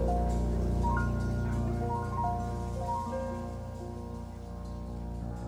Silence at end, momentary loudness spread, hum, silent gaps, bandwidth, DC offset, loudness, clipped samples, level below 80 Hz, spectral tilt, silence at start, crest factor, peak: 0 s; 11 LU; none; none; 11.5 kHz; under 0.1%; -34 LUFS; under 0.1%; -36 dBFS; -8 dB/octave; 0 s; 14 dB; -18 dBFS